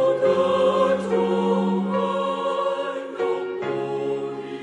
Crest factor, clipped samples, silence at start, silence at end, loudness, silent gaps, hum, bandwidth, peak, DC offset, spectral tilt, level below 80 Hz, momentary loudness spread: 14 dB; under 0.1%; 0 s; 0 s; -23 LUFS; none; none; 10 kHz; -8 dBFS; under 0.1%; -7 dB/octave; -64 dBFS; 8 LU